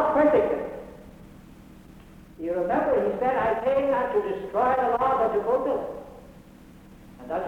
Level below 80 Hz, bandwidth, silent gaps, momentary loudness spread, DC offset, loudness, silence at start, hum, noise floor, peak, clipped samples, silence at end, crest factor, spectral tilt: -52 dBFS; 13.5 kHz; none; 15 LU; under 0.1%; -24 LUFS; 0 s; none; -49 dBFS; -10 dBFS; under 0.1%; 0 s; 16 dB; -7 dB/octave